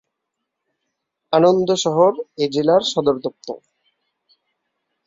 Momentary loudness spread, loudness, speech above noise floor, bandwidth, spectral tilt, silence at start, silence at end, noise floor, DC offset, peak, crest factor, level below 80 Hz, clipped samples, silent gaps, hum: 16 LU; -18 LUFS; 62 dB; 7.8 kHz; -5 dB/octave; 1.3 s; 1.5 s; -79 dBFS; under 0.1%; -2 dBFS; 18 dB; -62 dBFS; under 0.1%; none; none